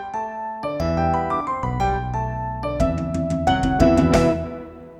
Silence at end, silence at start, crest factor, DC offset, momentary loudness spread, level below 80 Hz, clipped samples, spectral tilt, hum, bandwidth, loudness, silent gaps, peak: 0 s; 0 s; 18 dB; under 0.1%; 12 LU; -32 dBFS; under 0.1%; -7 dB/octave; none; 13 kHz; -21 LUFS; none; -4 dBFS